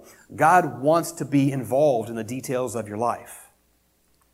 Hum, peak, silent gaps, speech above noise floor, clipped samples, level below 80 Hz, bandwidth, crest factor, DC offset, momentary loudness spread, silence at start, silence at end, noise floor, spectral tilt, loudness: none; -4 dBFS; none; 42 dB; under 0.1%; -64 dBFS; 16 kHz; 20 dB; under 0.1%; 13 LU; 0.3 s; 0.9 s; -65 dBFS; -6 dB/octave; -23 LUFS